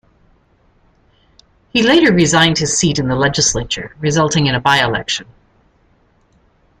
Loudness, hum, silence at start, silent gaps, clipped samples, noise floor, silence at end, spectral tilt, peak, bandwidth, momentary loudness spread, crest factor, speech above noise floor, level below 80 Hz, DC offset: -14 LUFS; none; 1.75 s; none; under 0.1%; -55 dBFS; 1.55 s; -3.5 dB/octave; 0 dBFS; 14.5 kHz; 9 LU; 16 dB; 41 dB; -42 dBFS; under 0.1%